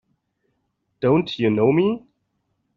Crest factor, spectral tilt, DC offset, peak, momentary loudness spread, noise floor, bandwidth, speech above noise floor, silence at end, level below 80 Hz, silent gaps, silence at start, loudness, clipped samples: 18 dB; -6 dB/octave; under 0.1%; -6 dBFS; 7 LU; -72 dBFS; 7 kHz; 54 dB; 0.8 s; -60 dBFS; none; 1 s; -20 LUFS; under 0.1%